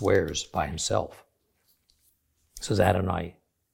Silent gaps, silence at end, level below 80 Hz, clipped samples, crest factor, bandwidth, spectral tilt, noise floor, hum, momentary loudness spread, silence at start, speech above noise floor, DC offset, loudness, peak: none; 0.4 s; -50 dBFS; under 0.1%; 24 dB; 16.5 kHz; -4.5 dB/octave; -70 dBFS; none; 16 LU; 0 s; 44 dB; under 0.1%; -27 LUFS; -6 dBFS